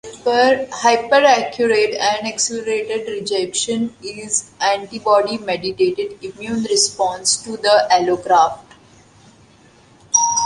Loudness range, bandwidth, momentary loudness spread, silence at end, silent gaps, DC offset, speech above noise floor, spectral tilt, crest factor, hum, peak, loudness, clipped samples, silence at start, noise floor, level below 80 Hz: 3 LU; 11.5 kHz; 10 LU; 0 s; none; under 0.1%; 32 dB; -1.5 dB/octave; 18 dB; none; 0 dBFS; -17 LUFS; under 0.1%; 0.05 s; -49 dBFS; -58 dBFS